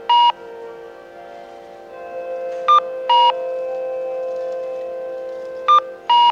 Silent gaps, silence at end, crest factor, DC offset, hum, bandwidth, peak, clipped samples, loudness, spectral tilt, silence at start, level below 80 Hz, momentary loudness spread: none; 0 s; 14 dB; under 0.1%; none; 7.2 kHz; -4 dBFS; under 0.1%; -18 LUFS; -2 dB/octave; 0 s; -68 dBFS; 23 LU